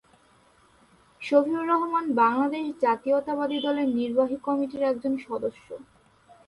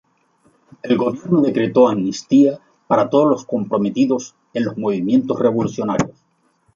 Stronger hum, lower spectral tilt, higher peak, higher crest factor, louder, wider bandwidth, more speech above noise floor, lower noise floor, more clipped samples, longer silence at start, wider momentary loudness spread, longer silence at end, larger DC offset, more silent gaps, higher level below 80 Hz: neither; about the same, -6 dB/octave vs -7 dB/octave; second, -8 dBFS vs -2 dBFS; about the same, 18 dB vs 16 dB; second, -25 LUFS vs -18 LUFS; first, 11.5 kHz vs 7.6 kHz; second, 35 dB vs 45 dB; about the same, -60 dBFS vs -61 dBFS; neither; first, 1.2 s vs 0.85 s; about the same, 10 LU vs 9 LU; about the same, 0.65 s vs 0.65 s; neither; neither; second, -68 dBFS vs -58 dBFS